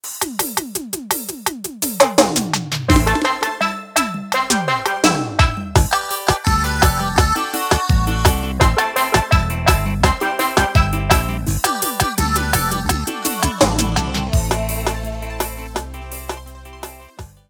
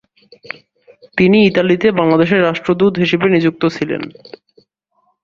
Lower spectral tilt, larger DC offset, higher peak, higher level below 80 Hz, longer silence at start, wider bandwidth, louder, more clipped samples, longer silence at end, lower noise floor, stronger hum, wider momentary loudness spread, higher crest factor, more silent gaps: second, -4 dB/octave vs -7.5 dB/octave; neither; about the same, 0 dBFS vs 0 dBFS; first, -26 dBFS vs -52 dBFS; second, 0.05 s vs 1.15 s; first, 19.5 kHz vs 7.4 kHz; second, -18 LUFS vs -14 LUFS; neither; second, 0.25 s vs 1.15 s; second, -38 dBFS vs -63 dBFS; neither; second, 10 LU vs 20 LU; about the same, 18 dB vs 14 dB; neither